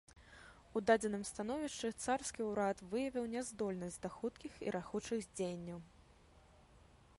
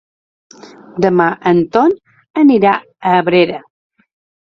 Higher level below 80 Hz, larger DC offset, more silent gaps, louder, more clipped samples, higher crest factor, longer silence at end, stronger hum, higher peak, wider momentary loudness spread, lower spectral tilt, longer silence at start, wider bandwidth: second, -66 dBFS vs -56 dBFS; neither; second, none vs 2.30-2.34 s; second, -40 LUFS vs -13 LUFS; neither; first, 22 dB vs 14 dB; second, 0.25 s vs 0.8 s; neither; second, -20 dBFS vs 0 dBFS; about the same, 14 LU vs 13 LU; second, -4.5 dB/octave vs -7.5 dB/octave; second, 0.1 s vs 0.95 s; first, 11.5 kHz vs 6.6 kHz